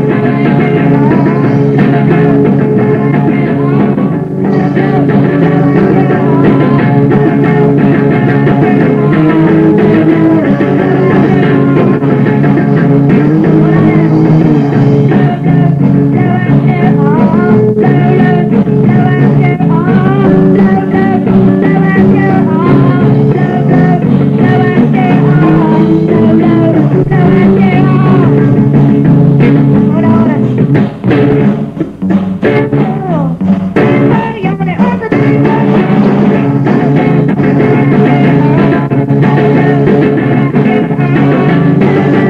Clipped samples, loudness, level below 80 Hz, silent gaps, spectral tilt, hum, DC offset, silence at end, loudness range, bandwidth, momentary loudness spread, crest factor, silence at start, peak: 2%; -8 LUFS; -36 dBFS; none; -10 dB/octave; none; under 0.1%; 0 s; 2 LU; 5.2 kHz; 3 LU; 6 dB; 0 s; 0 dBFS